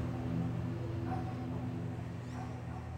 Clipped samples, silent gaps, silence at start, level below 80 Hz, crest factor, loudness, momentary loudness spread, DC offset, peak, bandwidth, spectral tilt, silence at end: under 0.1%; none; 0 s; -54 dBFS; 14 dB; -39 LUFS; 6 LU; under 0.1%; -24 dBFS; 9.2 kHz; -8.5 dB/octave; 0 s